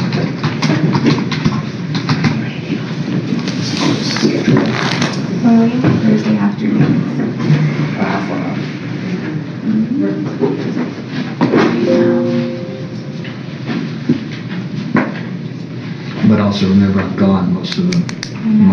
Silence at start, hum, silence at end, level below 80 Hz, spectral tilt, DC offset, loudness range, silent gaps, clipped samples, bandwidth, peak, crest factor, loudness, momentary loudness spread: 0 s; none; 0 s; -52 dBFS; -6.5 dB/octave; under 0.1%; 5 LU; none; under 0.1%; 7.2 kHz; 0 dBFS; 14 dB; -16 LUFS; 11 LU